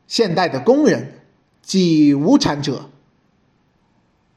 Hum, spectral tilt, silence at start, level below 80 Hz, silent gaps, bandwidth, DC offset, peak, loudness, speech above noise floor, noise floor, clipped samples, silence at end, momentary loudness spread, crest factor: none; -5.5 dB/octave; 0.1 s; -54 dBFS; none; 10 kHz; under 0.1%; -2 dBFS; -16 LUFS; 45 dB; -60 dBFS; under 0.1%; 1.5 s; 11 LU; 16 dB